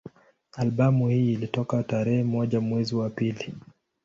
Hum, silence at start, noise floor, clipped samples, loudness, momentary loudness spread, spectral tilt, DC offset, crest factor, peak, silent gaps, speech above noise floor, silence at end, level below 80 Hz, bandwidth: none; 0.05 s; -48 dBFS; under 0.1%; -25 LUFS; 12 LU; -8 dB/octave; under 0.1%; 16 dB; -10 dBFS; none; 24 dB; 0.45 s; -60 dBFS; 7.4 kHz